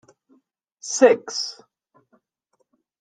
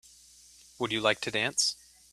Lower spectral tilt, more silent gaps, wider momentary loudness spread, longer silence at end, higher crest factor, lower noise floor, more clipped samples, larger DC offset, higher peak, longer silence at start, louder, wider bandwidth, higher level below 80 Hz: about the same, -2 dB/octave vs -1.5 dB/octave; neither; first, 15 LU vs 9 LU; first, 1.5 s vs 0.4 s; about the same, 24 dB vs 24 dB; first, -71 dBFS vs -56 dBFS; neither; neither; first, -2 dBFS vs -8 dBFS; about the same, 0.85 s vs 0.8 s; first, -20 LUFS vs -28 LUFS; second, 9.4 kHz vs 14.5 kHz; second, -78 dBFS vs -68 dBFS